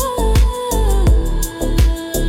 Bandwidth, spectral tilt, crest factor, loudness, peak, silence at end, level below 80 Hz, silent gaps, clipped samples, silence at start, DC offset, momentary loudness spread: 16.5 kHz; -5.5 dB/octave; 10 dB; -17 LUFS; -4 dBFS; 0 s; -16 dBFS; none; under 0.1%; 0 s; under 0.1%; 5 LU